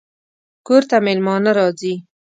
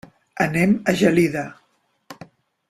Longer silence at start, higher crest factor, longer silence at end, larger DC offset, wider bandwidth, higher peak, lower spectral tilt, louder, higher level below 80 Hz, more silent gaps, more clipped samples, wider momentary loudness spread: first, 0.7 s vs 0.35 s; about the same, 16 dB vs 18 dB; second, 0.25 s vs 0.55 s; neither; second, 9.2 kHz vs 14.5 kHz; about the same, -2 dBFS vs -4 dBFS; about the same, -6 dB/octave vs -6 dB/octave; first, -16 LUFS vs -19 LUFS; second, -70 dBFS vs -56 dBFS; neither; neither; second, 9 LU vs 16 LU